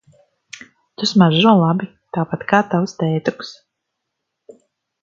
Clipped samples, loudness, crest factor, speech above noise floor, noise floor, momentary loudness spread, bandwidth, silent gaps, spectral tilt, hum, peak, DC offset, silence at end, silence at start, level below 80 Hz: under 0.1%; -17 LUFS; 20 dB; 61 dB; -77 dBFS; 25 LU; 7.6 kHz; none; -6.5 dB/octave; none; 0 dBFS; under 0.1%; 1.5 s; 1 s; -62 dBFS